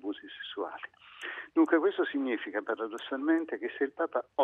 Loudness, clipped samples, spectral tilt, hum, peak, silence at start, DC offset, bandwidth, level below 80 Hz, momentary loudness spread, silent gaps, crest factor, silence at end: -32 LUFS; under 0.1%; -4.5 dB/octave; none; -14 dBFS; 0.05 s; under 0.1%; 8.4 kHz; -82 dBFS; 15 LU; none; 18 dB; 0 s